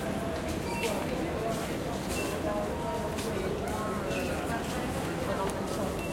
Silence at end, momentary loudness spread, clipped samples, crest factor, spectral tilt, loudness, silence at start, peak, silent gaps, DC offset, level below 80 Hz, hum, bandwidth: 0 s; 2 LU; under 0.1%; 14 dB; -5 dB/octave; -32 LUFS; 0 s; -18 dBFS; none; under 0.1%; -46 dBFS; none; 16.5 kHz